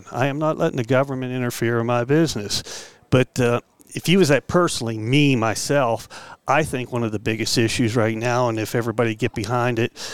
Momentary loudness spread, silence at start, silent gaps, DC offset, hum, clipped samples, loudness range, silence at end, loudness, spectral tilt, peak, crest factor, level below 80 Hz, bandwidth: 8 LU; 0 s; none; 0.7%; none; under 0.1%; 2 LU; 0 s; -21 LUFS; -5 dB/octave; -4 dBFS; 18 dB; -50 dBFS; 17 kHz